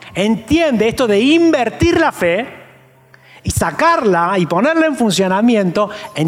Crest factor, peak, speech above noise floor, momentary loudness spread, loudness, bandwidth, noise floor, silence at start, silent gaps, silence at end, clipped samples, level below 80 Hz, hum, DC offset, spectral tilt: 12 dB; -4 dBFS; 33 dB; 7 LU; -14 LUFS; 16 kHz; -46 dBFS; 0 s; none; 0 s; under 0.1%; -40 dBFS; none; under 0.1%; -5 dB/octave